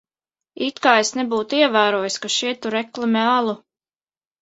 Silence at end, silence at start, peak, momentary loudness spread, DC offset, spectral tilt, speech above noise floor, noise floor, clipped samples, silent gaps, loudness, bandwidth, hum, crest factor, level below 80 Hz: 0.85 s; 0.6 s; 0 dBFS; 10 LU; under 0.1%; -2.5 dB/octave; over 71 dB; under -90 dBFS; under 0.1%; none; -19 LUFS; 8.2 kHz; none; 20 dB; -70 dBFS